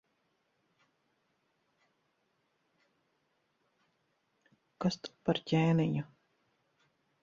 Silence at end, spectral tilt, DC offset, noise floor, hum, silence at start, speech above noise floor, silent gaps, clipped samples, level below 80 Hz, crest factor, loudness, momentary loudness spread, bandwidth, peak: 1.2 s; -7 dB/octave; under 0.1%; -78 dBFS; none; 4.8 s; 47 dB; none; under 0.1%; -72 dBFS; 22 dB; -33 LUFS; 10 LU; 7.6 kHz; -16 dBFS